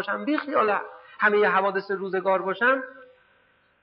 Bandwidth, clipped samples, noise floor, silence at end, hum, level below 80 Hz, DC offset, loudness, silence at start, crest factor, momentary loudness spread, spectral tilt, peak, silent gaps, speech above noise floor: 5.6 kHz; under 0.1%; -63 dBFS; 0.8 s; none; -80 dBFS; under 0.1%; -24 LUFS; 0 s; 16 dB; 8 LU; -8 dB/octave; -10 dBFS; none; 39 dB